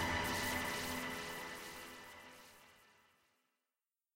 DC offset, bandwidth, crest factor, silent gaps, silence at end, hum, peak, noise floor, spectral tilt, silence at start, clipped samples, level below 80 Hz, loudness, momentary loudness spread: under 0.1%; 16 kHz; 18 dB; none; 1.25 s; none; -26 dBFS; under -90 dBFS; -3 dB/octave; 0 s; under 0.1%; -62 dBFS; -41 LUFS; 20 LU